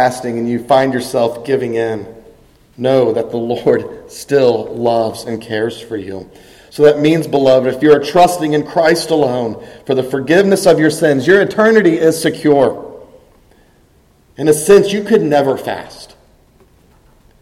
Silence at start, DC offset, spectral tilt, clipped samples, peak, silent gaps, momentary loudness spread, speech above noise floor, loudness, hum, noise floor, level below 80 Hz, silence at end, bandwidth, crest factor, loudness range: 0 s; under 0.1%; -5.5 dB/octave; under 0.1%; 0 dBFS; none; 15 LU; 38 dB; -13 LUFS; none; -50 dBFS; -50 dBFS; 1.35 s; 16 kHz; 14 dB; 5 LU